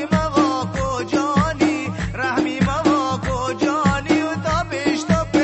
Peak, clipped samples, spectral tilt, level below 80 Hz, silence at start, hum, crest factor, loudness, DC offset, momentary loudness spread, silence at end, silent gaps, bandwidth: -2 dBFS; under 0.1%; -5.5 dB/octave; -36 dBFS; 0 s; none; 16 dB; -20 LUFS; under 0.1%; 5 LU; 0 s; none; 8.4 kHz